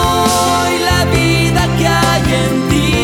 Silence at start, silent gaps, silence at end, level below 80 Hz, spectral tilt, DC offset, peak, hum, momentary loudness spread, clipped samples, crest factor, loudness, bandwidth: 0 s; none; 0 s; -26 dBFS; -4.5 dB/octave; under 0.1%; 0 dBFS; none; 2 LU; under 0.1%; 12 dB; -12 LUFS; 17.5 kHz